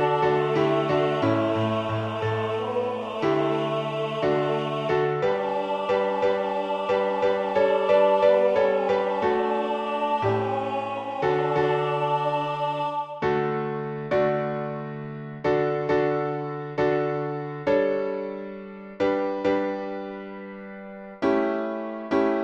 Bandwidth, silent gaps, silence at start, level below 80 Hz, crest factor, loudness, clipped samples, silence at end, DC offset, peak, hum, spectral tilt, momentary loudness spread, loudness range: 8.8 kHz; none; 0 s; -60 dBFS; 16 dB; -25 LUFS; under 0.1%; 0 s; under 0.1%; -8 dBFS; none; -7.5 dB/octave; 9 LU; 5 LU